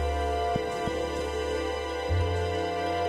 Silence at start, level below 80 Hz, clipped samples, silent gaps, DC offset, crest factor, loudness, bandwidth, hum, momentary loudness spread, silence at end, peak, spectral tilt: 0 s; -38 dBFS; under 0.1%; none; under 0.1%; 12 dB; -29 LUFS; 13.5 kHz; none; 3 LU; 0 s; -16 dBFS; -5.5 dB/octave